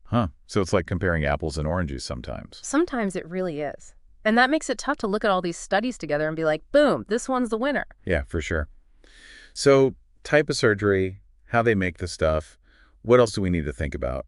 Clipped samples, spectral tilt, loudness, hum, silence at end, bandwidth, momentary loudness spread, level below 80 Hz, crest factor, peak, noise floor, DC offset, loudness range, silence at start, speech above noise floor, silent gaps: under 0.1%; -5.5 dB/octave; -24 LUFS; none; 0.05 s; 11.5 kHz; 11 LU; -40 dBFS; 20 dB; -4 dBFS; -51 dBFS; under 0.1%; 3 LU; 0.05 s; 28 dB; none